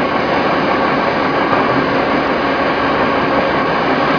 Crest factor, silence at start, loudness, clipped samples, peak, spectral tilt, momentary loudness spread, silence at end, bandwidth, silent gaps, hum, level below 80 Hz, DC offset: 14 dB; 0 s; -14 LUFS; under 0.1%; 0 dBFS; -6.5 dB/octave; 1 LU; 0 s; 5.4 kHz; none; none; -40 dBFS; under 0.1%